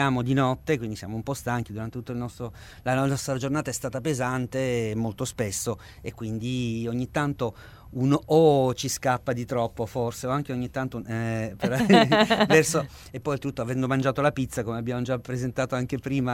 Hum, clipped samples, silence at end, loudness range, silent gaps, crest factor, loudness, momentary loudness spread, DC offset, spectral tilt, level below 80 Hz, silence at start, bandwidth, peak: none; under 0.1%; 0 s; 6 LU; none; 22 dB; -26 LUFS; 14 LU; under 0.1%; -5.5 dB/octave; -50 dBFS; 0 s; 16.5 kHz; -4 dBFS